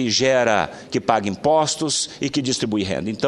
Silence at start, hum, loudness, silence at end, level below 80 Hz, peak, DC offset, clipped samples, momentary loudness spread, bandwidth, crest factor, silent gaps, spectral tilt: 0 s; none; -20 LUFS; 0 s; -54 dBFS; 0 dBFS; under 0.1%; under 0.1%; 7 LU; 12 kHz; 20 dB; none; -3.5 dB/octave